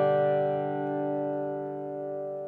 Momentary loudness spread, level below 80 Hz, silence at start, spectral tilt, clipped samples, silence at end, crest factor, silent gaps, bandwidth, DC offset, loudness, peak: 10 LU; -80 dBFS; 0 s; -10 dB/octave; under 0.1%; 0 s; 14 dB; none; 4.4 kHz; under 0.1%; -30 LUFS; -16 dBFS